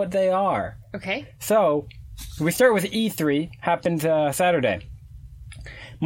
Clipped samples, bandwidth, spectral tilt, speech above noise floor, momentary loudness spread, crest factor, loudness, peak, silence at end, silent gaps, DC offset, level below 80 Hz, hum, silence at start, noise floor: under 0.1%; 17 kHz; -5 dB/octave; 20 dB; 21 LU; 18 dB; -23 LUFS; -6 dBFS; 0 s; none; under 0.1%; -48 dBFS; none; 0 s; -42 dBFS